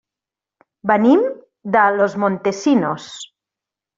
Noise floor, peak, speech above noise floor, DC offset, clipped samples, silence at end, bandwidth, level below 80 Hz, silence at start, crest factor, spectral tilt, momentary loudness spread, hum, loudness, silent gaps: -87 dBFS; -2 dBFS; 71 dB; under 0.1%; under 0.1%; 0.75 s; 7.8 kHz; -62 dBFS; 0.85 s; 16 dB; -6 dB/octave; 19 LU; none; -17 LUFS; none